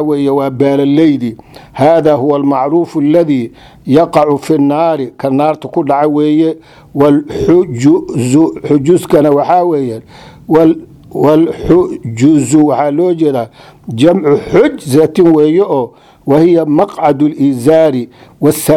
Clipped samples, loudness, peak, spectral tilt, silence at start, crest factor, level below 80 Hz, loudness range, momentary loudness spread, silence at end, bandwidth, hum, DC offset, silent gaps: 0.5%; -10 LUFS; 0 dBFS; -7 dB/octave; 0 s; 10 dB; -42 dBFS; 2 LU; 8 LU; 0 s; 16 kHz; none; under 0.1%; none